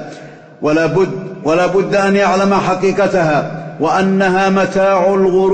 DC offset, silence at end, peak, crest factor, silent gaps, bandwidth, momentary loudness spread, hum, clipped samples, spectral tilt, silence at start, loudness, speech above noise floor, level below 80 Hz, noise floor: under 0.1%; 0 s; -2 dBFS; 10 dB; none; 8.8 kHz; 7 LU; none; under 0.1%; -6 dB/octave; 0 s; -13 LUFS; 21 dB; -46 dBFS; -34 dBFS